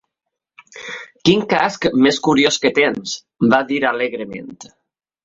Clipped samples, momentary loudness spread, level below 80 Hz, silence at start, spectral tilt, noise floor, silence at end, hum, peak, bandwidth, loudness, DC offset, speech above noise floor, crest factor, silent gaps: under 0.1%; 16 LU; -56 dBFS; 0.75 s; -4 dB/octave; -80 dBFS; 0.6 s; none; -2 dBFS; 7.8 kHz; -16 LUFS; under 0.1%; 64 dB; 18 dB; none